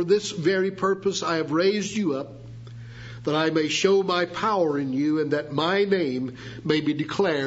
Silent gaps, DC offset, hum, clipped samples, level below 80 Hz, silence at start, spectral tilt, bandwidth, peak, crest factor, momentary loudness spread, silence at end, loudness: none; under 0.1%; none; under 0.1%; -60 dBFS; 0 s; -5 dB/octave; 8 kHz; -6 dBFS; 18 dB; 13 LU; 0 s; -24 LUFS